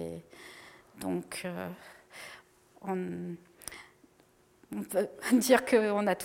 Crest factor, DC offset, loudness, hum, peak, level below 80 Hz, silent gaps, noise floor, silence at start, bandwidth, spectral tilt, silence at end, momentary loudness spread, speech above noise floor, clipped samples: 24 dB; under 0.1%; -31 LUFS; none; -8 dBFS; -70 dBFS; none; -64 dBFS; 0 s; 16.5 kHz; -4.5 dB/octave; 0 s; 25 LU; 34 dB; under 0.1%